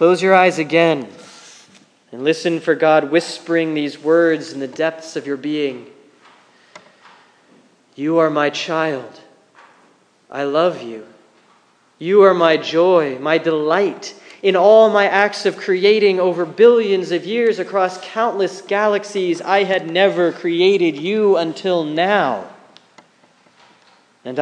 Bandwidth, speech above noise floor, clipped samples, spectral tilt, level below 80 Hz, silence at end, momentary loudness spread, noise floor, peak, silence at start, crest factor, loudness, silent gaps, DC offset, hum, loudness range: 10 kHz; 39 dB; under 0.1%; -5 dB/octave; -78 dBFS; 0 s; 13 LU; -55 dBFS; 0 dBFS; 0 s; 16 dB; -16 LUFS; none; under 0.1%; none; 9 LU